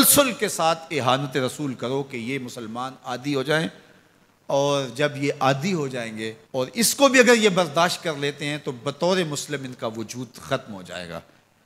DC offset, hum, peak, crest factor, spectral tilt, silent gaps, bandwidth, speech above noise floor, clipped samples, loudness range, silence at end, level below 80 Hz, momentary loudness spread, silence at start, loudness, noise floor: under 0.1%; none; -2 dBFS; 22 dB; -3.5 dB/octave; none; 16 kHz; 35 dB; under 0.1%; 7 LU; 0.45 s; -64 dBFS; 16 LU; 0 s; -23 LUFS; -58 dBFS